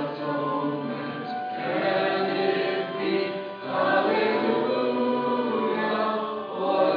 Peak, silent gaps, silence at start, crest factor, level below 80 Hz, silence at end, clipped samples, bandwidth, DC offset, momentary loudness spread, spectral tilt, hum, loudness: -10 dBFS; none; 0 s; 16 dB; -86 dBFS; 0 s; under 0.1%; 5.2 kHz; under 0.1%; 8 LU; -8 dB/octave; none; -26 LUFS